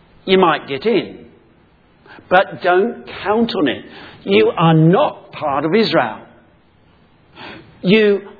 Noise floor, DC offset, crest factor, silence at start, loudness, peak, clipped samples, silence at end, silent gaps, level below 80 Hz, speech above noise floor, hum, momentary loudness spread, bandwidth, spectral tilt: -52 dBFS; under 0.1%; 16 dB; 0.25 s; -15 LUFS; 0 dBFS; under 0.1%; 0.05 s; none; -56 dBFS; 36 dB; none; 20 LU; 4.9 kHz; -8.5 dB/octave